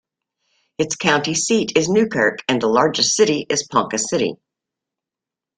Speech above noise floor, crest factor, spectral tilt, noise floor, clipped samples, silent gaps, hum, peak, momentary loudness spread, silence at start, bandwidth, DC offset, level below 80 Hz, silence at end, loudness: 69 dB; 18 dB; -3 dB/octave; -87 dBFS; under 0.1%; none; none; -2 dBFS; 6 LU; 0.8 s; 9.6 kHz; under 0.1%; -60 dBFS; 1.2 s; -18 LUFS